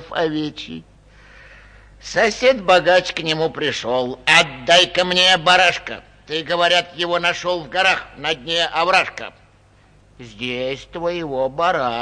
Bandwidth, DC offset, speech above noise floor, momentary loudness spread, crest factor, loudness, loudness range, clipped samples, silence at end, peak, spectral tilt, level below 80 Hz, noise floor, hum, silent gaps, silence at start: 10.5 kHz; under 0.1%; 33 dB; 14 LU; 18 dB; -17 LUFS; 7 LU; under 0.1%; 0 s; -2 dBFS; -2.5 dB/octave; -50 dBFS; -52 dBFS; none; none; 0 s